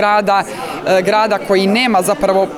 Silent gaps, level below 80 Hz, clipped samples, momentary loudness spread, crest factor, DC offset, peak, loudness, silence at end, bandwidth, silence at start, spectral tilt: none; -48 dBFS; under 0.1%; 4 LU; 12 dB; under 0.1%; -2 dBFS; -14 LUFS; 0 s; 19 kHz; 0 s; -4.5 dB/octave